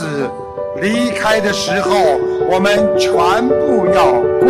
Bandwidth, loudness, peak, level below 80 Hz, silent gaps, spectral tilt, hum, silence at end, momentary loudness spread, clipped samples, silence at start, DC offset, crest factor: 15 kHz; -14 LUFS; -2 dBFS; -44 dBFS; none; -4.5 dB/octave; none; 0 s; 9 LU; under 0.1%; 0 s; under 0.1%; 12 dB